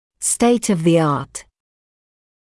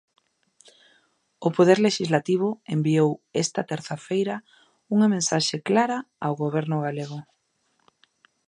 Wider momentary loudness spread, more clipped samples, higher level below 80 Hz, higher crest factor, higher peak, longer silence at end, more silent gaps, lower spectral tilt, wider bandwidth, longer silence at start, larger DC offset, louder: first, 14 LU vs 10 LU; neither; first, -54 dBFS vs -72 dBFS; second, 14 dB vs 20 dB; about the same, -4 dBFS vs -4 dBFS; second, 1 s vs 1.25 s; neither; about the same, -5 dB/octave vs -5 dB/octave; about the same, 12 kHz vs 11 kHz; second, 0.2 s vs 1.4 s; neither; first, -17 LUFS vs -24 LUFS